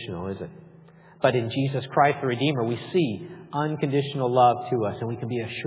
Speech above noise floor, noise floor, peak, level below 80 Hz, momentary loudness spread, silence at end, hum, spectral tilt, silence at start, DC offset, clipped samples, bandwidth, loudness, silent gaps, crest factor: 26 dB; -51 dBFS; -6 dBFS; -58 dBFS; 13 LU; 0 s; none; -10.5 dB/octave; 0 s; under 0.1%; under 0.1%; 4 kHz; -25 LUFS; none; 20 dB